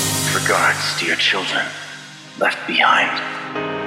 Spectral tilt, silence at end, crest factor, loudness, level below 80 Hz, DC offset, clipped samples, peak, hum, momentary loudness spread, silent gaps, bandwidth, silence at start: -2 dB/octave; 0 s; 18 dB; -17 LUFS; -60 dBFS; under 0.1%; under 0.1%; -2 dBFS; 50 Hz at -55 dBFS; 15 LU; none; 16.5 kHz; 0 s